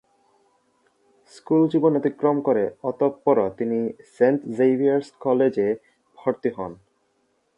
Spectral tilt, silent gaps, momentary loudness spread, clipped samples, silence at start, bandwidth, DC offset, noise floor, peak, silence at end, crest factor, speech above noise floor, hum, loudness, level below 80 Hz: -8.5 dB/octave; none; 9 LU; under 0.1%; 1.5 s; 10 kHz; under 0.1%; -68 dBFS; -6 dBFS; 0.85 s; 18 dB; 47 dB; none; -22 LUFS; -66 dBFS